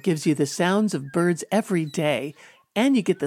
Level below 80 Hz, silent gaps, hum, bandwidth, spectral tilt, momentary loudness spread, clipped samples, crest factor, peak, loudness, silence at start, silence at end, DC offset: -72 dBFS; none; none; 17 kHz; -5.5 dB/octave; 6 LU; under 0.1%; 14 dB; -8 dBFS; -23 LUFS; 0.05 s; 0 s; under 0.1%